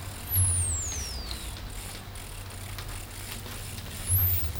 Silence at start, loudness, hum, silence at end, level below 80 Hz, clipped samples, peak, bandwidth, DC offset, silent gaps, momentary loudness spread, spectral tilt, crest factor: 0 s; -30 LUFS; none; 0 s; -40 dBFS; under 0.1%; -14 dBFS; 18 kHz; under 0.1%; none; 16 LU; -3 dB/octave; 16 dB